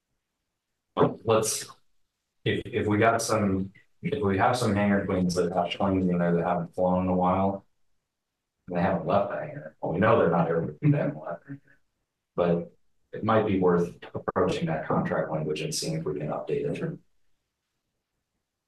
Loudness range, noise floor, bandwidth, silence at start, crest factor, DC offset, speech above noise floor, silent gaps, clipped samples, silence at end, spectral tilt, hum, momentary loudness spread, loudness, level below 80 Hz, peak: 4 LU; -83 dBFS; 12.5 kHz; 0.95 s; 18 dB; under 0.1%; 58 dB; none; under 0.1%; 1.7 s; -6 dB/octave; none; 13 LU; -26 LUFS; -62 dBFS; -10 dBFS